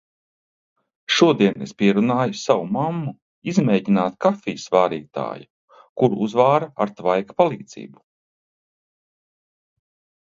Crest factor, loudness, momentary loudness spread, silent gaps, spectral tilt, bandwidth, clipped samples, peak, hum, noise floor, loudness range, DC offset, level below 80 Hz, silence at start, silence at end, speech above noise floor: 20 dB; -20 LUFS; 15 LU; 3.22-3.42 s, 5.50-5.68 s, 5.89-5.96 s; -6 dB/octave; 7.6 kHz; under 0.1%; 0 dBFS; none; under -90 dBFS; 5 LU; under 0.1%; -64 dBFS; 1.1 s; 2.4 s; over 70 dB